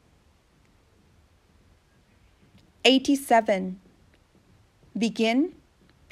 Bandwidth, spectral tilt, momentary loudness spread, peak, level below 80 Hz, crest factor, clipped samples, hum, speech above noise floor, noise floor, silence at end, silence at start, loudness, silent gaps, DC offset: 14.5 kHz; -4 dB/octave; 15 LU; -4 dBFS; -64 dBFS; 24 dB; under 0.1%; none; 39 dB; -61 dBFS; 0.6 s; 2.85 s; -23 LUFS; none; under 0.1%